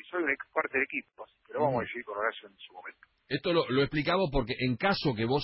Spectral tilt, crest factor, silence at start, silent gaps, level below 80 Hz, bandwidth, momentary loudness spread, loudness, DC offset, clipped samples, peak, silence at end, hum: -9.5 dB/octave; 18 dB; 0.05 s; none; -52 dBFS; 5.8 kHz; 18 LU; -30 LUFS; under 0.1%; under 0.1%; -14 dBFS; 0 s; none